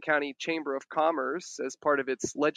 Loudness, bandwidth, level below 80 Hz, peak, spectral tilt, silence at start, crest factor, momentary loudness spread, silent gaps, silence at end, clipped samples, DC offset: -30 LUFS; 11.5 kHz; -74 dBFS; -12 dBFS; -3.5 dB/octave; 0 s; 18 dB; 6 LU; none; 0.05 s; under 0.1%; under 0.1%